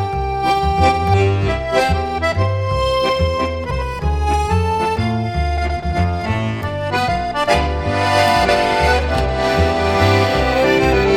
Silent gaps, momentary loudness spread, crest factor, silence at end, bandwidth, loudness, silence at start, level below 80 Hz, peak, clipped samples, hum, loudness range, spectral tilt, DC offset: none; 6 LU; 16 dB; 0 s; 15.5 kHz; -17 LUFS; 0 s; -26 dBFS; -2 dBFS; under 0.1%; none; 4 LU; -6 dB/octave; under 0.1%